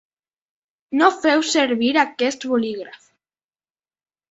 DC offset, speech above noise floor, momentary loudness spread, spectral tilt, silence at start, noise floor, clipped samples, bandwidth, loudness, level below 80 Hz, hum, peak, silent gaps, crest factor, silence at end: under 0.1%; over 71 dB; 11 LU; -2.5 dB/octave; 0.9 s; under -90 dBFS; under 0.1%; 8 kHz; -19 LUFS; -68 dBFS; none; -2 dBFS; none; 20 dB; 1.4 s